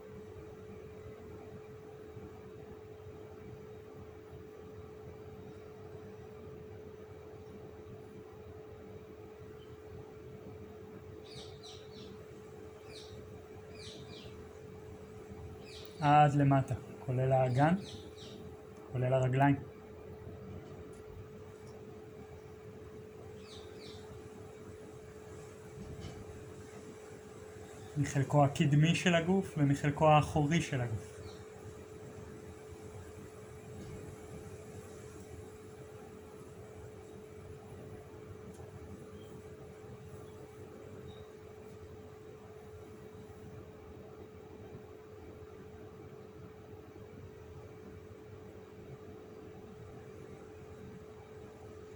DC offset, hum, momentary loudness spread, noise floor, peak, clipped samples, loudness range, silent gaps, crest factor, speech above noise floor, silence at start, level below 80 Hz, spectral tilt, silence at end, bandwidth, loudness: under 0.1%; none; 21 LU; -52 dBFS; -14 dBFS; under 0.1%; 20 LU; none; 24 dB; 22 dB; 0 s; -62 dBFS; -6.5 dB/octave; 0 s; over 20 kHz; -33 LUFS